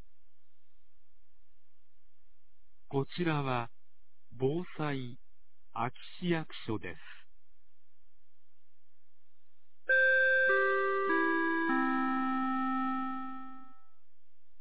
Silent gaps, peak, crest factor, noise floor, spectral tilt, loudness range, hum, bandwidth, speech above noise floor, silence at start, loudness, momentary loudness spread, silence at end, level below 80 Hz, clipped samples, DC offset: none; -18 dBFS; 16 dB; -85 dBFS; -4 dB/octave; 13 LU; none; 4 kHz; 50 dB; 2.9 s; -31 LUFS; 19 LU; 0.95 s; -72 dBFS; under 0.1%; 1%